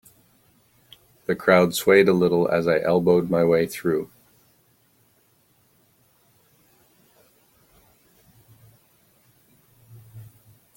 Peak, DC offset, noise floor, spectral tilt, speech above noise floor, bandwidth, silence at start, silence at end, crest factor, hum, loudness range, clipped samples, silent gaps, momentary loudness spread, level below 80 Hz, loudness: -2 dBFS; under 0.1%; -62 dBFS; -6 dB/octave; 43 dB; 17 kHz; 1.3 s; 0.55 s; 24 dB; none; 10 LU; under 0.1%; none; 11 LU; -62 dBFS; -20 LUFS